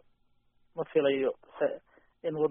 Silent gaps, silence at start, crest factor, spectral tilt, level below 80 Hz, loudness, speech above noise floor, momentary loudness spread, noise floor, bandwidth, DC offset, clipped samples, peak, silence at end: none; 0.75 s; 18 dB; -4.5 dB/octave; -74 dBFS; -31 LUFS; 39 dB; 14 LU; -69 dBFS; 3.7 kHz; under 0.1%; under 0.1%; -14 dBFS; 0 s